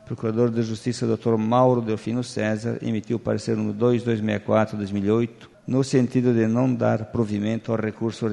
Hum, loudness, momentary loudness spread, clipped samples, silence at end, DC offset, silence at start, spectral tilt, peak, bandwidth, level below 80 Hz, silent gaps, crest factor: none; -23 LUFS; 7 LU; under 0.1%; 0 s; under 0.1%; 0.05 s; -7.5 dB/octave; -4 dBFS; 11 kHz; -58 dBFS; none; 18 dB